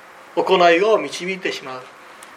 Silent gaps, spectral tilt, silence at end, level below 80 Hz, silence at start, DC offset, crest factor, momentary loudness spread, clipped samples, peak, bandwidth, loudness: none; -4 dB/octave; 0 s; -74 dBFS; 0.2 s; under 0.1%; 18 dB; 17 LU; under 0.1%; -2 dBFS; 14 kHz; -18 LUFS